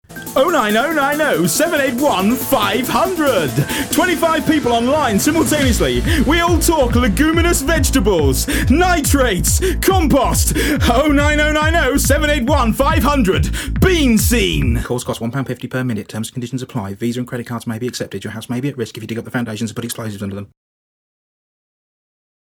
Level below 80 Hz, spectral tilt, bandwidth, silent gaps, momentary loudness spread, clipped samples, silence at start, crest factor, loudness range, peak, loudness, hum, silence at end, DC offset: -24 dBFS; -4.5 dB/octave; 20 kHz; none; 11 LU; under 0.1%; 0.1 s; 16 dB; 10 LU; 0 dBFS; -16 LUFS; none; 2.1 s; under 0.1%